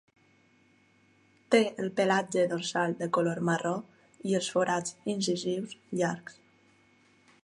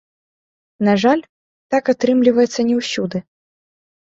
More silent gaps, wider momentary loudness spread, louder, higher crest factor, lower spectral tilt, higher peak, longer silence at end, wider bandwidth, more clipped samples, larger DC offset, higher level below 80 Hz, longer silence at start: second, none vs 1.29-1.70 s; about the same, 10 LU vs 8 LU; second, -30 LUFS vs -17 LUFS; first, 22 dB vs 16 dB; about the same, -4.5 dB/octave vs -5.5 dB/octave; second, -10 dBFS vs -2 dBFS; first, 1.15 s vs 0.85 s; first, 11.5 kHz vs 8 kHz; neither; neither; second, -78 dBFS vs -60 dBFS; first, 1.5 s vs 0.8 s